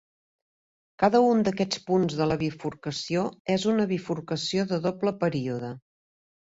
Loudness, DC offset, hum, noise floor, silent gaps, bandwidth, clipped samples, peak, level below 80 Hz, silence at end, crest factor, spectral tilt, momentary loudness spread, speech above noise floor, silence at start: -26 LUFS; under 0.1%; none; under -90 dBFS; 3.40-3.45 s; 8 kHz; under 0.1%; -8 dBFS; -60 dBFS; 0.7 s; 18 dB; -6 dB/octave; 10 LU; over 64 dB; 1 s